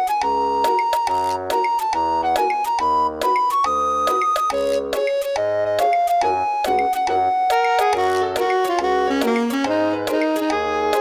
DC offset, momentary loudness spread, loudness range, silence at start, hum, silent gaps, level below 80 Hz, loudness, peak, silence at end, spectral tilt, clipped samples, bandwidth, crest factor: under 0.1%; 3 LU; 1 LU; 0 s; none; none; -52 dBFS; -19 LUFS; -6 dBFS; 0 s; -3.5 dB/octave; under 0.1%; 19 kHz; 14 dB